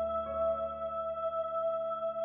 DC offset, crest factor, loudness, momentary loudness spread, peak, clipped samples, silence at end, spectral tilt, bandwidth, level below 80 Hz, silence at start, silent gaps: under 0.1%; 10 dB; -34 LUFS; 3 LU; -24 dBFS; under 0.1%; 0 s; -3 dB/octave; 3.5 kHz; -58 dBFS; 0 s; none